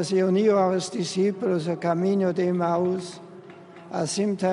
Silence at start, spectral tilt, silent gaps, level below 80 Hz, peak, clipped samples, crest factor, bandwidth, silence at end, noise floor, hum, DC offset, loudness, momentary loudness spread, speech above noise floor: 0 s; -6 dB/octave; none; -70 dBFS; -10 dBFS; under 0.1%; 14 dB; 11 kHz; 0 s; -45 dBFS; none; under 0.1%; -24 LUFS; 12 LU; 22 dB